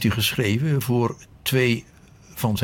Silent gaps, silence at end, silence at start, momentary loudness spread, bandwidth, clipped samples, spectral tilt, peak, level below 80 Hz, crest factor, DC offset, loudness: none; 0 s; 0 s; 7 LU; 19 kHz; under 0.1%; -5 dB/octave; -8 dBFS; -50 dBFS; 14 dB; under 0.1%; -23 LUFS